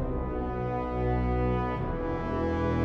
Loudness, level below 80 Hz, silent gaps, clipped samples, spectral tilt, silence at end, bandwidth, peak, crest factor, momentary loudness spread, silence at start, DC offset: -30 LUFS; -36 dBFS; none; under 0.1%; -9.5 dB/octave; 0 s; 6.4 kHz; -16 dBFS; 12 dB; 4 LU; 0 s; under 0.1%